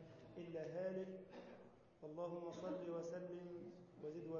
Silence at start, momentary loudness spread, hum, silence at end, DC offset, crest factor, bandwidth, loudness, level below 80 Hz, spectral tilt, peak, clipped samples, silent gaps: 0 s; 12 LU; none; 0 s; under 0.1%; 14 dB; 7 kHz; -51 LUFS; -84 dBFS; -7 dB/octave; -36 dBFS; under 0.1%; none